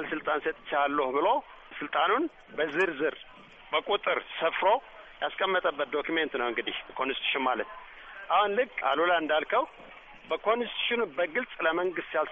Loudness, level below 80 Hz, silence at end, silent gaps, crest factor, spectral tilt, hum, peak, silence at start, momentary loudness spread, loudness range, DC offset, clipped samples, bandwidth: -29 LUFS; -62 dBFS; 0 s; none; 16 dB; 0 dB/octave; none; -14 dBFS; 0 s; 11 LU; 2 LU; under 0.1%; under 0.1%; 7.8 kHz